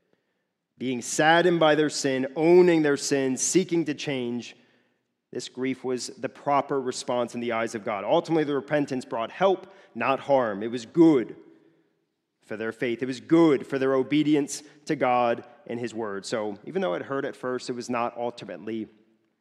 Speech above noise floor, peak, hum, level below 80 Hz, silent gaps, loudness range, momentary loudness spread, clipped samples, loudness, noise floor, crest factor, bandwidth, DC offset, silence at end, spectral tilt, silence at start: 53 dB; -6 dBFS; none; -78 dBFS; none; 8 LU; 14 LU; under 0.1%; -25 LUFS; -78 dBFS; 20 dB; 13 kHz; under 0.1%; 0.55 s; -4.5 dB/octave; 0.8 s